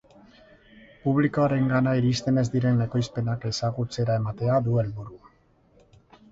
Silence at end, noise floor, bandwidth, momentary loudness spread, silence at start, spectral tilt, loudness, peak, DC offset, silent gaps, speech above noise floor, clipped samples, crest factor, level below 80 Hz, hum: 1.15 s; -60 dBFS; 7.8 kHz; 6 LU; 1.05 s; -7 dB/octave; -25 LUFS; -10 dBFS; under 0.1%; none; 37 dB; under 0.1%; 16 dB; -54 dBFS; none